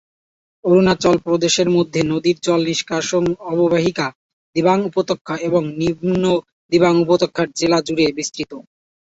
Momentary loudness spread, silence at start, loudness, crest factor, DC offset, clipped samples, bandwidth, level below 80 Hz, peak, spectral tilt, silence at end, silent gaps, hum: 9 LU; 0.65 s; -18 LUFS; 16 dB; under 0.1%; under 0.1%; 8 kHz; -52 dBFS; -2 dBFS; -5 dB/octave; 0.4 s; 4.15-4.53 s, 5.21-5.25 s, 6.52-6.69 s; none